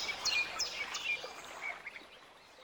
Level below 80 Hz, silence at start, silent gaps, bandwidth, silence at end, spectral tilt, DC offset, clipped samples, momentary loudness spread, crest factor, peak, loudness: -70 dBFS; 0 s; none; 19 kHz; 0 s; 1 dB/octave; under 0.1%; under 0.1%; 22 LU; 18 dB; -22 dBFS; -36 LUFS